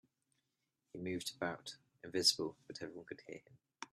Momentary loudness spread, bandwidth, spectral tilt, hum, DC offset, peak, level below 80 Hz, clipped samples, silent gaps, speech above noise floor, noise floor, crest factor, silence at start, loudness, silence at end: 22 LU; 14 kHz; -2.5 dB/octave; none; under 0.1%; -18 dBFS; -80 dBFS; under 0.1%; none; 46 dB; -87 dBFS; 26 dB; 0.95 s; -39 LUFS; 0.05 s